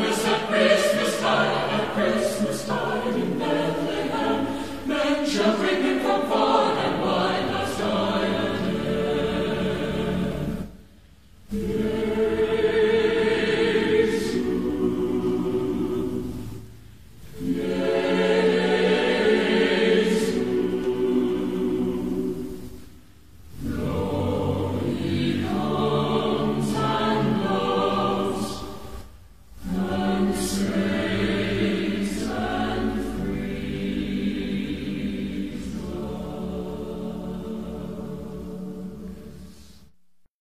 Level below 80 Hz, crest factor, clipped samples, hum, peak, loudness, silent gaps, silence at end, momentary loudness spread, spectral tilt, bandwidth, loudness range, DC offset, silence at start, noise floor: -44 dBFS; 18 dB; under 0.1%; none; -6 dBFS; -24 LUFS; none; 0.1 s; 13 LU; -5.5 dB/octave; 15 kHz; 7 LU; 0.6%; 0 s; -59 dBFS